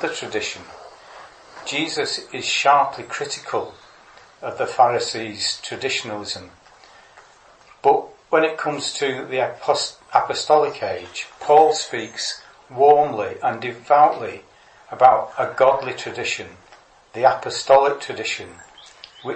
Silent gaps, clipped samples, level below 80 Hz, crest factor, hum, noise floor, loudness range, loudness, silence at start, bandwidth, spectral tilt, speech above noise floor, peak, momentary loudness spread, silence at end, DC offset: none; under 0.1%; -64 dBFS; 20 dB; none; -50 dBFS; 5 LU; -20 LUFS; 0 s; 8.8 kHz; -2.5 dB/octave; 30 dB; 0 dBFS; 16 LU; 0 s; under 0.1%